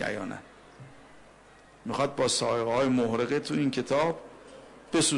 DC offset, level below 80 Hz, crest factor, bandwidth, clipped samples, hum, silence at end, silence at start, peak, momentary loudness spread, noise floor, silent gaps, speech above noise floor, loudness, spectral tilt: under 0.1%; -62 dBFS; 14 dB; 11 kHz; under 0.1%; none; 0 s; 0 s; -16 dBFS; 20 LU; -55 dBFS; none; 27 dB; -28 LUFS; -4 dB/octave